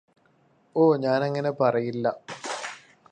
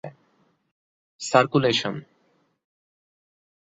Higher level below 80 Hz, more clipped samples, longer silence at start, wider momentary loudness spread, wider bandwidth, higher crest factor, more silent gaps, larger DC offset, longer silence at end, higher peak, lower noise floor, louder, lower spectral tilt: second, -74 dBFS vs -68 dBFS; neither; first, 0.75 s vs 0.05 s; second, 14 LU vs 19 LU; first, 10 kHz vs 8.4 kHz; second, 18 dB vs 26 dB; second, none vs 0.71-1.19 s; neither; second, 0.35 s vs 1.65 s; second, -8 dBFS vs -2 dBFS; second, -63 dBFS vs -67 dBFS; second, -25 LUFS vs -22 LUFS; first, -6 dB/octave vs -4.5 dB/octave